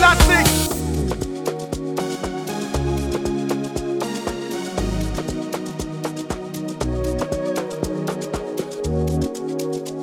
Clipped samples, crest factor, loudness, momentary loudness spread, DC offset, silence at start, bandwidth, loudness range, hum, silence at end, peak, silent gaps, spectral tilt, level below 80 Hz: under 0.1%; 20 dB; -23 LUFS; 8 LU; under 0.1%; 0 s; 19 kHz; 4 LU; none; 0 s; -2 dBFS; none; -4.5 dB/octave; -30 dBFS